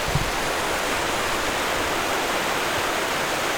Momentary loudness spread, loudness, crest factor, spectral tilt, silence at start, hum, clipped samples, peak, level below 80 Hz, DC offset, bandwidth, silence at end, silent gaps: 1 LU; -23 LUFS; 14 dB; -2.5 dB/octave; 0 s; none; under 0.1%; -10 dBFS; -40 dBFS; under 0.1%; over 20 kHz; 0 s; none